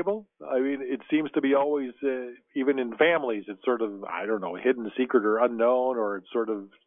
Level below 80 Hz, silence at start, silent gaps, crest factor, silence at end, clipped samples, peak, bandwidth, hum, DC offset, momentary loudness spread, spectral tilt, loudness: -78 dBFS; 0 s; none; 18 dB; 0.2 s; under 0.1%; -8 dBFS; 3.8 kHz; none; under 0.1%; 9 LU; -8.5 dB/octave; -27 LUFS